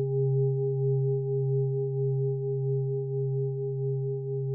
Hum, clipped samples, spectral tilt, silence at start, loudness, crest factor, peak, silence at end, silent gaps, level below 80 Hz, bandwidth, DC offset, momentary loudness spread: none; under 0.1%; -17.5 dB/octave; 0 s; -29 LUFS; 8 dB; -18 dBFS; 0 s; none; -76 dBFS; 0.9 kHz; under 0.1%; 4 LU